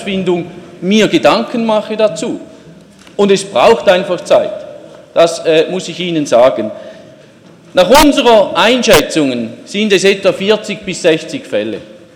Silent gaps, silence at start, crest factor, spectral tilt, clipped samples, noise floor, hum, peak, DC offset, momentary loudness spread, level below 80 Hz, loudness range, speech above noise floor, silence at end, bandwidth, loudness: none; 0 s; 12 dB; -4 dB/octave; 0.1%; -40 dBFS; none; 0 dBFS; under 0.1%; 13 LU; -40 dBFS; 4 LU; 29 dB; 0.2 s; 18 kHz; -11 LUFS